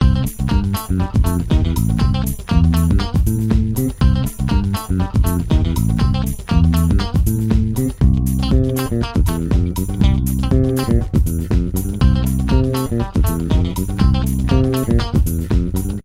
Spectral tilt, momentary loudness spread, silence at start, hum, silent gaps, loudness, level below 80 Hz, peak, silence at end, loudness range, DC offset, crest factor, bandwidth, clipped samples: -7 dB/octave; 3 LU; 0 s; none; none; -17 LUFS; -20 dBFS; 0 dBFS; 0.05 s; 1 LU; under 0.1%; 16 dB; 16 kHz; under 0.1%